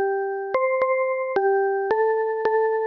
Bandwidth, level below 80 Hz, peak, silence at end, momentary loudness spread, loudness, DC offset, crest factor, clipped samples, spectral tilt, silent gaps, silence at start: 5.4 kHz; -70 dBFS; -12 dBFS; 0 s; 3 LU; -22 LUFS; under 0.1%; 10 dB; under 0.1%; -6.5 dB/octave; none; 0 s